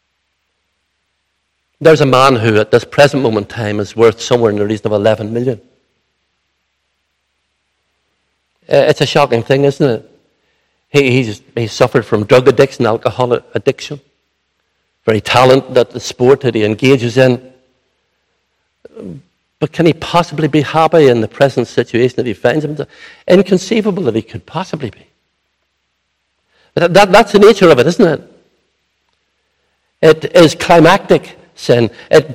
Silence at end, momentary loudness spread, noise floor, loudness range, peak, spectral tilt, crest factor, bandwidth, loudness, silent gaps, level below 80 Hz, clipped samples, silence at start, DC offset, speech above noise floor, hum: 0 s; 14 LU; -66 dBFS; 7 LU; 0 dBFS; -6 dB/octave; 12 dB; 16 kHz; -11 LUFS; none; -48 dBFS; 1%; 1.8 s; under 0.1%; 56 dB; none